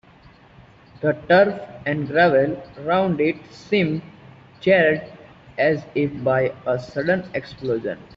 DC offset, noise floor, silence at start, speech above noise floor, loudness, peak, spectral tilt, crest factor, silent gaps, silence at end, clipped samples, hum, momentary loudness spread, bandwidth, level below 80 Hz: under 0.1%; -49 dBFS; 1 s; 29 dB; -21 LUFS; -4 dBFS; -4.5 dB/octave; 18 dB; none; 0.1 s; under 0.1%; none; 12 LU; 7.2 kHz; -56 dBFS